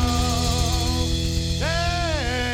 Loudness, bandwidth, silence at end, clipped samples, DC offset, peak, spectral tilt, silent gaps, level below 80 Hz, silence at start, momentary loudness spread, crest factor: -23 LUFS; 16 kHz; 0 s; under 0.1%; under 0.1%; -8 dBFS; -4 dB/octave; none; -28 dBFS; 0 s; 2 LU; 14 dB